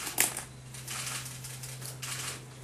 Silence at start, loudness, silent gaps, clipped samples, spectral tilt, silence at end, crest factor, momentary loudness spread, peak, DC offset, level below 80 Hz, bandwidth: 0 s; -35 LUFS; none; under 0.1%; -1.5 dB/octave; 0 s; 30 dB; 12 LU; -6 dBFS; under 0.1%; -62 dBFS; 15 kHz